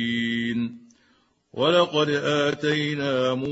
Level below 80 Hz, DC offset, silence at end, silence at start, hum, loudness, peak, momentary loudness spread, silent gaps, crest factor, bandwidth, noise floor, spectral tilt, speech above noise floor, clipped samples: -64 dBFS; under 0.1%; 0 s; 0 s; none; -23 LUFS; -6 dBFS; 8 LU; none; 18 dB; 8 kHz; -64 dBFS; -5.5 dB/octave; 41 dB; under 0.1%